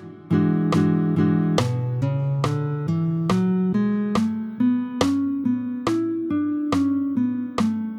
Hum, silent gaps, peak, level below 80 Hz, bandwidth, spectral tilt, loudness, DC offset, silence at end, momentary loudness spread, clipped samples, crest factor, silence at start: none; none; -4 dBFS; -54 dBFS; 12 kHz; -7.5 dB/octave; -22 LUFS; under 0.1%; 0 s; 4 LU; under 0.1%; 18 dB; 0 s